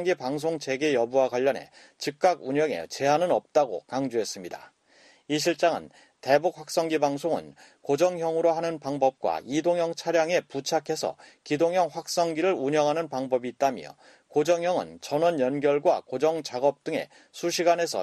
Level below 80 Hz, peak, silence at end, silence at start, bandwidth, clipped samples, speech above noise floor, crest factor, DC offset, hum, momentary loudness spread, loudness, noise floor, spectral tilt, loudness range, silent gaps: -72 dBFS; -6 dBFS; 0 s; 0 s; 13 kHz; under 0.1%; 32 dB; 20 dB; under 0.1%; none; 9 LU; -26 LUFS; -58 dBFS; -4.5 dB/octave; 2 LU; none